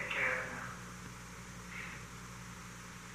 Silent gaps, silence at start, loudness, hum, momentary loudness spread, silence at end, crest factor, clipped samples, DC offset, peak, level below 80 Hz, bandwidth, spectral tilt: none; 0 s; -42 LUFS; 60 Hz at -55 dBFS; 14 LU; 0 s; 20 dB; under 0.1%; under 0.1%; -22 dBFS; -60 dBFS; 15.5 kHz; -3.5 dB/octave